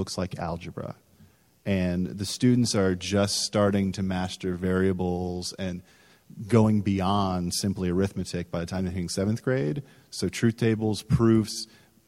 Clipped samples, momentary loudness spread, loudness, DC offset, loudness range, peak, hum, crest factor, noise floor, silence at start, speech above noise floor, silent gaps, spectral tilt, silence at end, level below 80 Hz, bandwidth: under 0.1%; 12 LU; -26 LUFS; under 0.1%; 3 LU; -6 dBFS; none; 20 dB; -58 dBFS; 0 s; 32 dB; none; -5.5 dB/octave; 0.45 s; -52 dBFS; 16 kHz